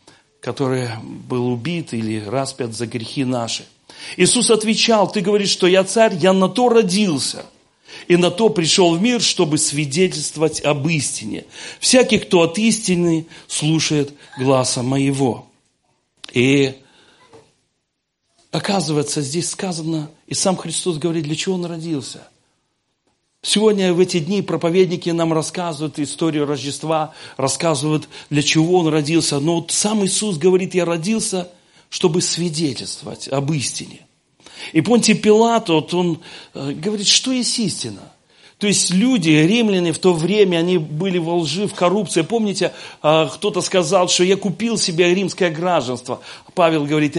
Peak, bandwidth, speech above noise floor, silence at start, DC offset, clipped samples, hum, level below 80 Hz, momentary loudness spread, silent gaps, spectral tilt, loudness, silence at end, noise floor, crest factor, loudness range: 0 dBFS; 11.5 kHz; 56 dB; 0.45 s; under 0.1%; under 0.1%; none; -58 dBFS; 12 LU; none; -4 dB/octave; -17 LUFS; 0 s; -73 dBFS; 18 dB; 6 LU